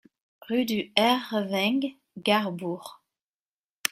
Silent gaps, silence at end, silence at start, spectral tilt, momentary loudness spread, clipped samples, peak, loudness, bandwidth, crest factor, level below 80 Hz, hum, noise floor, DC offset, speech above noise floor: 3.24-3.82 s; 0.05 s; 0.5 s; -4 dB/octave; 12 LU; under 0.1%; -2 dBFS; -26 LUFS; 16 kHz; 26 dB; -74 dBFS; none; under -90 dBFS; under 0.1%; over 64 dB